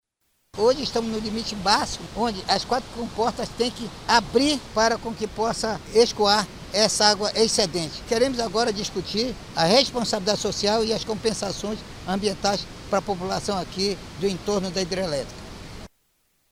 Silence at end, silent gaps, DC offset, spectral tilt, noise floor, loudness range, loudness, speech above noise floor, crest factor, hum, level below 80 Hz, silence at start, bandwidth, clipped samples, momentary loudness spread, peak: 0.65 s; none; under 0.1%; -3.5 dB/octave; -71 dBFS; 5 LU; -23 LUFS; 47 dB; 22 dB; none; -46 dBFS; 0.55 s; 16 kHz; under 0.1%; 10 LU; -2 dBFS